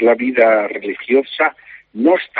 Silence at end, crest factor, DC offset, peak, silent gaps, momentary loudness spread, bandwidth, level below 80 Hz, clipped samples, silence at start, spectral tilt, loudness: 0 s; 16 dB; under 0.1%; 0 dBFS; none; 10 LU; 4.8 kHz; -64 dBFS; under 0.1%; 0 s; -2 dB/octave; -16 LUFS